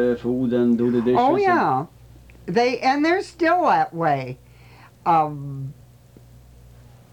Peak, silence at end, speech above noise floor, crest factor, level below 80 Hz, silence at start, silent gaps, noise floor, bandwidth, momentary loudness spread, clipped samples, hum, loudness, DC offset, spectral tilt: -8 dBFS; 1.4 s; 28 dB; 14 dB; -54 dBFS; 0 s; none; -48 dBFS; 18 kHz; 16 LU; under 0.1%; none; -20 LUFS; under 0.1%; -6.5 dB/octave